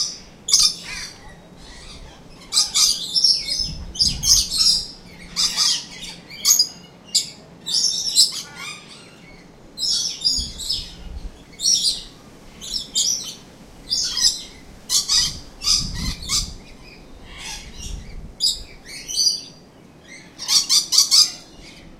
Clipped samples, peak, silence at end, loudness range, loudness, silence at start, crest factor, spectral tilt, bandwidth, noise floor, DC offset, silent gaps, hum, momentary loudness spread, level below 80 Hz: under 0.1%; 0 dBFS; 0 s; 8 LU; -18 LUFS; 0 s; 22 dB; 0.5 dB/octave; 16 kHz; -46 dBFS; under 0.1%; none; none; 20 LU; -40 dBFS